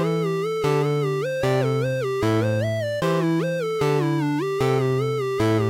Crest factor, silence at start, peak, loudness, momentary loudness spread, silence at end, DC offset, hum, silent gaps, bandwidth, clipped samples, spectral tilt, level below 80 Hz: 10 dB; 0 s; -10 dBFS; -23 LUFS; 3 LU; 0 s; under 0.1%; none; none; 16 kHz; under 0.1%; -7 dB/octave; -52 dBFS